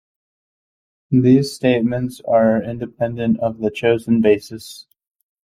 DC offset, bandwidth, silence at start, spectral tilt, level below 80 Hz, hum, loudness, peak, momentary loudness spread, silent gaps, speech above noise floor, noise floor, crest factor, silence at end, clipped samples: under 0.1%; 15 kHz; 1.1 s; -7 dB/octave; -52 dBFS; none; -18 LUFS; -2 dBFS; 10 LU; none; over 73 dB; under -90 dBFS; 16 dB; 0.7 s; under 0.1%